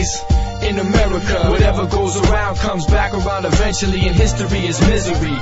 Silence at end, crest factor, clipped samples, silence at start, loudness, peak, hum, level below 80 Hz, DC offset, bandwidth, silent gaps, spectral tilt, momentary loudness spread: 0 s; 14 dB; under 0.1%; 0 s; -16 LUFS; -2 dBFS; none; -20 dBFS; 2%; 8 kHz; none; -5 dB/octave; 4 LU